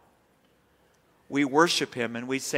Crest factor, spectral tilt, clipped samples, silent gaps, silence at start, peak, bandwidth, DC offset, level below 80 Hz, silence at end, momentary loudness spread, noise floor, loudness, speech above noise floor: 22 dB; -3.5 dB/octave; under 0.1%; none; 1.3 s; -6 dBFS; 16 kHz; under 0.1%; -74 dBFS; 0 s; 10 LU; -65 dBFS; -26 LUFS; 39 dB